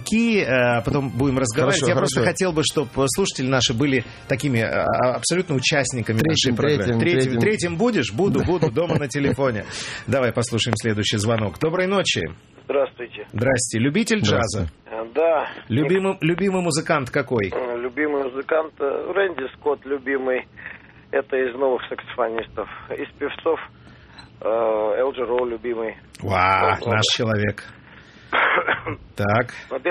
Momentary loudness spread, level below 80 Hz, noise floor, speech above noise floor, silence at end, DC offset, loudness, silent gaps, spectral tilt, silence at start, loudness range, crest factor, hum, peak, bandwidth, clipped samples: 9 LU; -48 dBFS; -45 dBFS; 24 dB; 0 s; under 0.1%; -21 LUFS; none; -4.5 dB/octave; 0 s; 5 LU; 20 dB; none; -2 dBFS; 13.5 kHz; under 0.1%